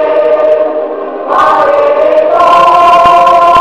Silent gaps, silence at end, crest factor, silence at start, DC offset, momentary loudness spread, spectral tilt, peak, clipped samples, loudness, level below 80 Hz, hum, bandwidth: none; 0 s; 6 dB; 0 s; 0.7%; 9 LU; -4.5 dB/octave; 0 dBFS; 3%; -6 LUFS; -42 dBFS; none; 12.5 kHz